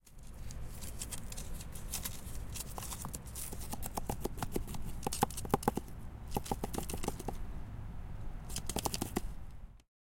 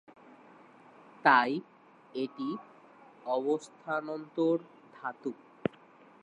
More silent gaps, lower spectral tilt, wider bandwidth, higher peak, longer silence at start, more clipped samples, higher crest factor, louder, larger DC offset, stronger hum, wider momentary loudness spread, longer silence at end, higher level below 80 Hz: neither; second, -4 dB/octave vs -5.5 dB/octave; first, 17 kHz vs 10.5 kHz; second, -12 dBFS vs -8 dBFS; second, 0.05 s vs 1.25 s; neither; about the same, 26 dB vs 24 dB; second, -41 LUFS vs -32 LUFS; neither; neither; second, 13 LU vs 17 LU; second, 0.2 s vs 0.9 s; first, -46 dBFS vs -80 dBFS